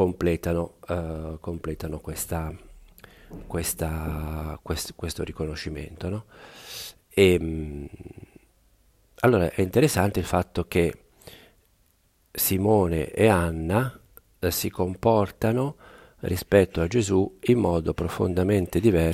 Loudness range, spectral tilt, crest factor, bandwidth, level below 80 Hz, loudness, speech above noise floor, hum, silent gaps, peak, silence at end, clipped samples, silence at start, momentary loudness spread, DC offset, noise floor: 8 LU; -6 dB/octave; 20 dB; 16 kHz; -42 dBFS; -25 LUFS; 40 dB; none; none; -4 dBFS; 0 s; under 0.1%; 0 s; 15 LU; under 0.1%; -65 dBFS